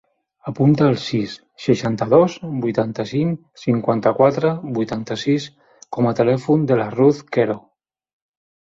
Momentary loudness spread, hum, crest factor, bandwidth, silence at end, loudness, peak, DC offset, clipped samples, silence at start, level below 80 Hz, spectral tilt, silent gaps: 10 LU; none; 18 dB; 7.8 kHz; 1.05 s; -19 LUFS; -2 dBFS; under 0.1%; under 0.1%; 0.45 s; -56 dBFS; -7.5 dB/octave; none